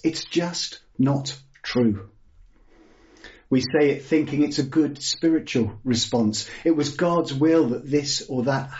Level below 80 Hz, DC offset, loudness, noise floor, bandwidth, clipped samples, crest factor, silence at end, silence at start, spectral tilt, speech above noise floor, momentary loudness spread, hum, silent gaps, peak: -56 dBFS; under 0.1%; -23 LUFS; -53 dBFS; 8 kHz; under 0.1%; 16 dB; 0 s; 0.05 s; -5 dB/octave; 31 dB; 7 LU; none; none; -8 dBFS